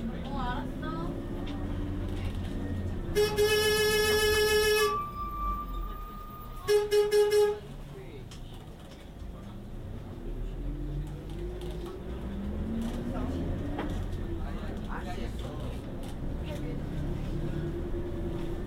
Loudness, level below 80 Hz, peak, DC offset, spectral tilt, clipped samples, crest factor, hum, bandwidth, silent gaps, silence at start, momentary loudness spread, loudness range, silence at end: -31 LUFS; -38 dBFS; -14 dBFS; under 0.1%; -4.5 dB/octave; under 0.1%; 18 dB; none; 16 kHz; none; 0 s; 19 LU; 13 LU; 0 s